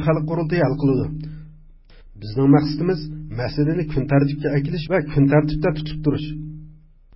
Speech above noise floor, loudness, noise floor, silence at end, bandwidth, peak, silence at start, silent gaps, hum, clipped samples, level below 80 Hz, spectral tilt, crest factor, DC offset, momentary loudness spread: 26 dB; -20 LUFS; -46 dBFS; 0.4 s; 5.8 kHz; -2 dBFS; 0 s; none; none; under 0.1%; -40 dBFS; -12.5 dB/octave; 18 dB; under 0.1%; 17 LU